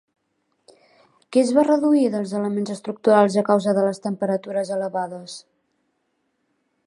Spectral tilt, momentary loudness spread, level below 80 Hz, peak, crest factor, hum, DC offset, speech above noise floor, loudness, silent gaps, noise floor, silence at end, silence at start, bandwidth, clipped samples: -6.5 dB/octave; 12 LU; -74 dBFS; -2 dBFS; 20 dB; none; under 0.1%; 52 dB; -21 LUFS; none; -72 dBFS; 1.5 s; 1.3 s; 11.5 kHz; under 0.1%